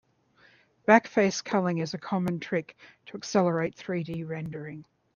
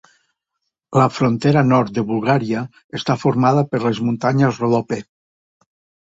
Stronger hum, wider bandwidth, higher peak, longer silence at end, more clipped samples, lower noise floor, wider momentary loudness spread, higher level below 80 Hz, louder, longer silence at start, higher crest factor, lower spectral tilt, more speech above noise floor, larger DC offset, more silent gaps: neither; second, 7.2 kHz vs 8 kHz; about the same, -4 dBFS vs -2 dBFS; second, 0.3 s vs 1 s; neither; second, -62 dBFS vs -77 dBFS; first, 18 LU vs 9 LU; second, -68 dBFS vs -56 dBFS; second, -27 LUFS vs -18 LUFS; about the same, 0.9 s vs 0.9 s; first, 24 dB vs 16 dB; second, -5.5 dB/octave vs -7.5 dB/octave; second, 34 dB vs 60 dB; neither; second, none vs 2.84-2.89 s